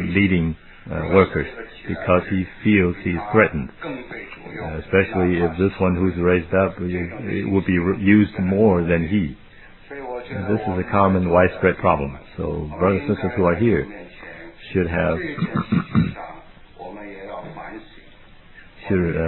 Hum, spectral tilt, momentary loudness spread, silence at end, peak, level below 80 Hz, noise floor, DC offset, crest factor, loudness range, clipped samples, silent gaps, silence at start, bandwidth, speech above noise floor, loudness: none; -11.5 dB/octave; 18 LU; 0 s; -2 dBFS; -42 dBFS; -45 dBFS; under 0.1%; 20 dB; 5 LU; under 0.1%; none; 0 s; 4.2 kHz; 26 dB; -20 LUFS